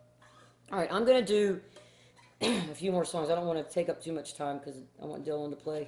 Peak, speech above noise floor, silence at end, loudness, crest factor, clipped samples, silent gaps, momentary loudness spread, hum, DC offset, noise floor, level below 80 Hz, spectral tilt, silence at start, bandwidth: -14 dBFS; 29 dB; 0 s; -32 LUFS; 20 dB; under 0.1%; none; 14 LU; none; under 0.1%; -60 dBFS; -70 dBFS; -5 dB/octave; 0.7 s; 12 kHz